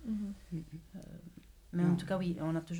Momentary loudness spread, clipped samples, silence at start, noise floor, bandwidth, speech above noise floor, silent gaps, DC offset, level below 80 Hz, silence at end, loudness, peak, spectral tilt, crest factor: 19 LU; under 0.1%; 0 s; -55 dBFS; 11.5 kHz; 22 dB; none; under 0.1%; -58 dBFS; 0 s; -36 LUFS; -18 dBFS; -8 dB/octave; 18 dB